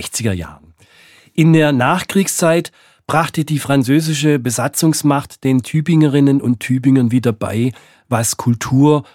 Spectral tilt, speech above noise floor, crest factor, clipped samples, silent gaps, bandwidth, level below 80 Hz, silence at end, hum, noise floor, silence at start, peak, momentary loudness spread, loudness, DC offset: -5.5 dB/octave; 33 dB; 14 dB; under 0.1%; none; 17 kHz; -52 dBFS; 0.1 s; none; -47 dBFS; 0 s; 0 dBFS; 8 LU; -15 LUFS; under 0.1%